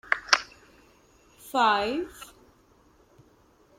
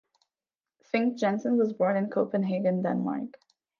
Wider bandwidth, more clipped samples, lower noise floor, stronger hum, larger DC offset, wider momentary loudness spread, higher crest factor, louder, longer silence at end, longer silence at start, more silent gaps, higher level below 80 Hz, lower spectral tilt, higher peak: first, 16.5 kHz vs 7 kHz; neither; second, -60 dBFS vs under -90 dBFS; neither; neither; first, 23 LU vs 6 LU; first, 30 dB vs 18 dB; first, -25 LUFS vs -28 LUFS; first, 1.55 s vs 0.5 s; second, 0.1 s vs 0.95 s; neither; first, -62 dBFS vs -78 dBFS; second, -1.5 dB/octave vs -8 dB/octave; first, 0 dBFS vs -12 dBFS